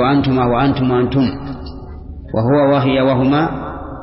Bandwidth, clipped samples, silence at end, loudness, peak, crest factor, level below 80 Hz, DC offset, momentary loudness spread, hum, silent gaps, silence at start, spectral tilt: 5.8 kHz; under 0.1%; 0 s; -15 LUFS; -4 dBFS; 12 dB; -34 dBFS; under 0.1%; 17 LU; none; none; 0 s; -12 dB/octave